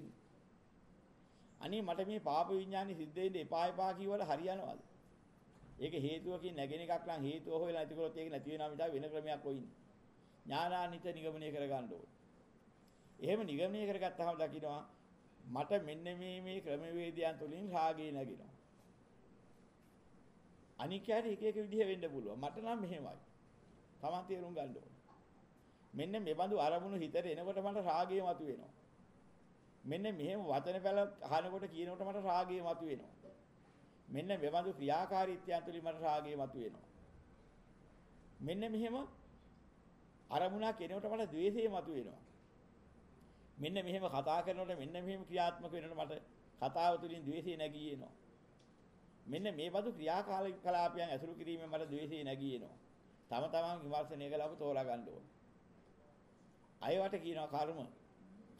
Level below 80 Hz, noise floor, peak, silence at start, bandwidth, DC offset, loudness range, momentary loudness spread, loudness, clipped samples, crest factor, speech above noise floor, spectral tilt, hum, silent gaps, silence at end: -74 dBFS; -67 dBFS; -24 dBFS; 0 s; 13 kHz; under 0.1%; 5 LU; 12 LU; -42 LUFS; under 0.1%; 18 dB; 26 dB; -6.5 dB/octave; none; none; 0.05 s